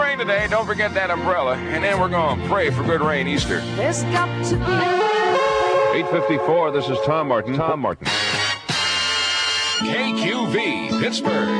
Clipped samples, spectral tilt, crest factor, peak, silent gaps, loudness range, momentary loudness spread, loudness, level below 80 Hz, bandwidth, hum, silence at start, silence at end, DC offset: under 0.1%; -4 dB/octave; 14 dB; -6 dBFS; none; 1 LU; 3 LU; -20 LUFS; -44 dBFS; 10.5 kHz; none; 0 s; 0 s; under 0.1%